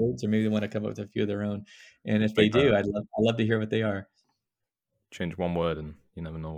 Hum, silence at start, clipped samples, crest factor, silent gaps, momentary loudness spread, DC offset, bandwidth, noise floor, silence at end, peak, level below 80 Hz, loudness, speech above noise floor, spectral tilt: none; 0 s; under 0.1%; 20 dB; none; 15 LU; under 0.1%; 9.2 kHz; -87 dBFS; 0 s; -8 dBFS; -56 dBFS; -27 LUFS; 59 dB; -7 dB/octave